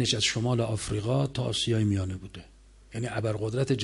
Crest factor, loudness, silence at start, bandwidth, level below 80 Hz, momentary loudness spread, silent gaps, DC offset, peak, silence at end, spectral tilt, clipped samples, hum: 16 dB; -28 LUFS; 0 s; 11.5 kHz; -48 dBFS; 14 LU; none; under 0.1%; -12 dBFS; 0 s; -5 dB/octave; under 0.1%; none